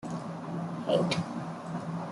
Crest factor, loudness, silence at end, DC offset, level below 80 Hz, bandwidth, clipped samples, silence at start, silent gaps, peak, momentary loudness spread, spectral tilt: 20 dB; -33 LUFS; 0 s; under 0.1%; -68 dBFS; 11.5 kHz; under 0.1%; 0 s; none; -14 dBFS; 10 LU; -6 dB/octave